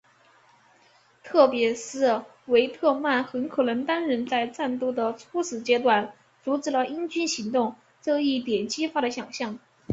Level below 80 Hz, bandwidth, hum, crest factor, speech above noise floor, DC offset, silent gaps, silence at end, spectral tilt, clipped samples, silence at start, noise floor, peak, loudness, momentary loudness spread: -70 dBFS; 8 kHz; none; 22 dB; 35 dB; under 0.1%; none; 0 s; -3.5 dB/octave; under 0.1%; 1.25 s; -60 dBFS; -4 dBFS; -25 LUFS; 10 LU